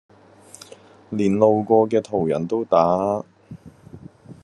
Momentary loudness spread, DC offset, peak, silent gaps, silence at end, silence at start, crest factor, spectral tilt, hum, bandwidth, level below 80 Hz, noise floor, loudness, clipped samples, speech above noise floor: 17 LU; under 0.1%; -2 dBFS; none; 0.1 s; 1.1 s; 20 dB; -7.5 dB/octave; none; 11.5 kHz; -64 dBFS; -47 dBFS; -20 LUFS; under 0.1%; 29 dB